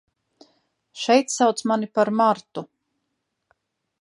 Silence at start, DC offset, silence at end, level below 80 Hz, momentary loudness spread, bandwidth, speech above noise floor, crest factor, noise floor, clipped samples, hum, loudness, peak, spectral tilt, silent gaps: 0.95 s; under 0.1%; 1.35 s; -78 dBFS; 12 LU; 11.5 kHz; 57 dB; 20 dB; -77 dBFS; under 0.1%; none; -21 LUFS; -4 dBFS; -4 dB/octave; none